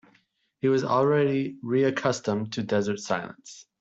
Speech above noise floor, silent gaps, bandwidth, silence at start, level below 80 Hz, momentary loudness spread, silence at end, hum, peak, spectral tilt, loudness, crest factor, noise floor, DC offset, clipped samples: 41 dB; none; 8 kHz; 0.65 s; -70 dBFS; 8 LU; 0.2 s; none; -10 dBFS; -6 dB/octave; -26 LUFS; 16 dB; -67 dBFS; under 0.1%; under 0.1%